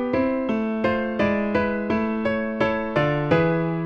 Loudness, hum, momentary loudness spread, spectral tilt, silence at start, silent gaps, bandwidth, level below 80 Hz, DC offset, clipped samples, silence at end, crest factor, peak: -23 LUFS; none; 4 LU; -8.5 dB/octave; 0 s; none; 6.6 kHz; -46 dBFS; under 0.1%; under 0.1%; 0 s; 16 dB; -6 dBFS